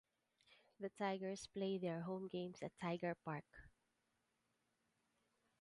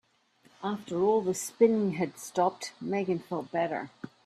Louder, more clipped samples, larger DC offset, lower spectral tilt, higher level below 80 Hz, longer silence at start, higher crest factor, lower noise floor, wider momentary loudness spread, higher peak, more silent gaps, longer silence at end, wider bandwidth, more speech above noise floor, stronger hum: second, -47 LUFS vs -30 LUFS; neither; neither; about the same, -6 dB/octave vs -5.5 dB/octave; second, -80 dBFS vs -74 dBFS; about the same, 0.5 s vs 0.6 s; about the same, 18 dB vs 20 dB; first, -86 dBFS vs -65 dBFS; second, 9 LU vs 12 LU; second, -30 dBFS vs -10 dBFS; neither; first, 1.9 s vs 0.15 s; second, 11 kHz vs 14 kHz; first, 40 dB vs 36 dB; neither